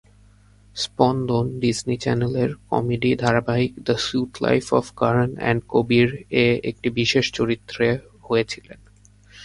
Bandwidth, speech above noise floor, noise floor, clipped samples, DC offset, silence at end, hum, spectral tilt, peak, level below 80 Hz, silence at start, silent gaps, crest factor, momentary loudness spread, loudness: 11.5 kHz; 31 dB; -52 dBFS; under 0.1%; under 0.1%; 0 s; none; -5.5 dB/octave; 0 dBFS; -50 dBFS; 0.75 s; none; 22 dB; 5 LU; -22 LUFS